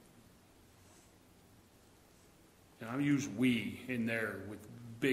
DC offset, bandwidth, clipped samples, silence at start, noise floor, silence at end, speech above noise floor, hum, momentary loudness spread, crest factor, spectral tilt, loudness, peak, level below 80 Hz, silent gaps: under 0.1%; 16 kHz; under 0.1%; 0.15 s; -64 dBFS; 0 s; 28 dB; none; 17 LU; 20 dB; -5.5 dB/octave; -36 LUFS; -18 dBFS; -72 dBFS; none